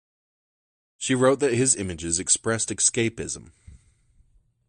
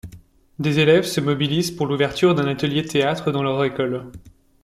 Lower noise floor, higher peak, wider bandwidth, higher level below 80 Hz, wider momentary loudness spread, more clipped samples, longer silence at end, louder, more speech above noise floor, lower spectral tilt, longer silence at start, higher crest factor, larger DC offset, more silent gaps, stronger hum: first, -61 dBFS vs -47 dBFS; about the same, -4 dBFS vs -4 dBFS; second, 11.5 kHz vs 15 kHz; about the same, -56 dBFS vs -52 dBFS; first, 12 LU vs 8 LU; neither; first, 0.9 s vs 0.35 s; second, -23 LUFS vs -20 LUFS; first, 37 dB vs 27 dB; second, -3 dB/octave vs -5.5 dB/octave; first, 1 s vs 0.05 s; first, 22 dB vs 16 dB; neither; neither; neither